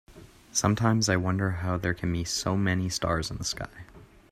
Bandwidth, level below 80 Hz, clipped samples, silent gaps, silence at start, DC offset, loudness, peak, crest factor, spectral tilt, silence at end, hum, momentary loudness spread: 15 kHz; -50 dBFS; under 0.1%; none; 0.1 s; under 0.1%; -28 LUFS; -10 dBFS; 18 dB; -4.5 dB/octave; 0.25 s; none; 8 LU